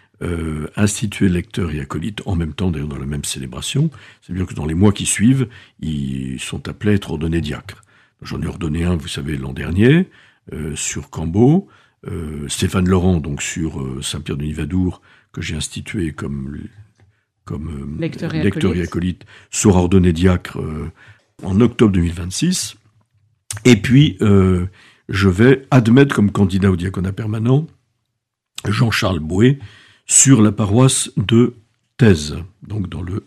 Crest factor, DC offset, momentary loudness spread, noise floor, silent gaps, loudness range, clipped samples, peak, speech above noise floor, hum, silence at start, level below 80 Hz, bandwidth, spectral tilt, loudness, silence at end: 18 dB; under 0.1%; 14 LU; -76 dBFS; none; 9 LU; under 0.1%; 0 dBFS; 59 dB; none; 0.2 s; -38 dBFS; 14.5 kHz; -5.5 dB/octave; -17 LUFS; 0.05 s